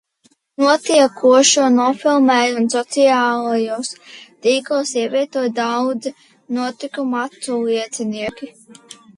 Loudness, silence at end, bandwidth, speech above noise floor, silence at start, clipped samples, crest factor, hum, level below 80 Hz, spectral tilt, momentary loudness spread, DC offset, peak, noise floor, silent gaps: -17 LUFS; 0.7 s; 11.5 kHz; 42 dB; 0.6 s; under 0.1%; 16 dB; none; -66 dBFS; -2.5 dB/octave; 14 LU; under 0.1%; -2 dBFS; -59 dBFS; none